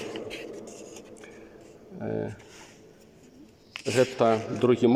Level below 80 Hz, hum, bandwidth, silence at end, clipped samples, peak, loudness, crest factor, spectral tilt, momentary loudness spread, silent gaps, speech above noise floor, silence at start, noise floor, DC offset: -64 dBFS; none; 14.5 kHz; 0 s; under 0.1%; -8 dBFS; -28 LUFS; 20 dB; -6 dB/octave; 25 LU; none; 29 dB; 0 s; -53 dBFS; under 0.1%